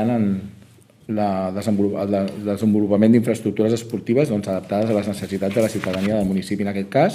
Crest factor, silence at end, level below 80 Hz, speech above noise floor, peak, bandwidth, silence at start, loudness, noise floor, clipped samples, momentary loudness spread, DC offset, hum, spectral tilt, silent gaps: 16 dB; 0 s; -56 dBFS; 29 dB; -4 dBFS; 15 kHz; 0 s; -21 LUFS; -49 dBFS; under 0.1%; 7 LU; under 0.1%; none; -7 dB/octave; none